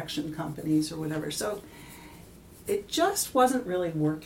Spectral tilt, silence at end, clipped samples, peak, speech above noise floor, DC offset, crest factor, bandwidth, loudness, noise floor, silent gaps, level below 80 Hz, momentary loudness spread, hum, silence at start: -4.5 dB/octave; 0 s; under 0.1%; -10 dBFS; 21 dB; under 0.1%; 18 dB; 17 kHz; -28 LUFS; -50 dBFS; none; -58 dBFS; 22 LU; none; 0 s